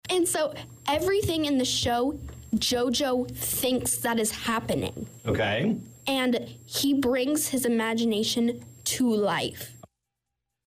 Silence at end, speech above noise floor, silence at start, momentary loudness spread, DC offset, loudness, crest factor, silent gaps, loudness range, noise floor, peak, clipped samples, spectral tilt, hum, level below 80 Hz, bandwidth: 0.85 s; 57 dB; 0.05 s; 7 LU; under 0.1%; -26 LUFS; 10 dB; none; 1 LU; -84 dBFS; -18 dBFS; under 0.1%; -3.5 dB/octave; none; -52 dBFS; 16 kHz